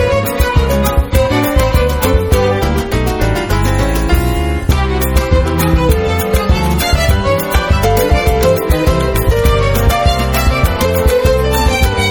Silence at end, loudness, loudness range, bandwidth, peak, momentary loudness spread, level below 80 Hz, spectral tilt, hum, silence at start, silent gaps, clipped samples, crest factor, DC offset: 0 s; -13 LUFS; 2 LU; over 20 kHz; 0 dBFS; 3 LU; -16 dBFS; -5.5 dB/octave; none; 0 s; none; under 0.1%; 12 dB; under 0.1%